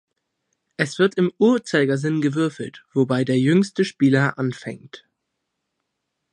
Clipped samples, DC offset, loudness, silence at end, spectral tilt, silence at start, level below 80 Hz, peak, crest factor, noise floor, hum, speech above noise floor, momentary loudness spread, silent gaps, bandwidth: under 0.1%; under 0.1%; -20 LUFS; 1.35 s; -6.5 dB/octave; 0.8 s; -68 dBFS; -2 dBFS; 18 dB; -78 dBFS; none; 58 dB; 14 LU; none; 11 kHz